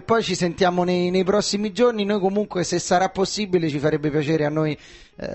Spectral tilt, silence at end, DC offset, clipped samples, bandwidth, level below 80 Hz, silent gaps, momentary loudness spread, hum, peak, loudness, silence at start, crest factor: -5 dB/octave; 0 s; under 0.1%; under 0.1%; 8.6 kHz; -52 dBFS; none; 4 LU; none; -6 dBFS; -21 LUFS; 0 s; 16 dB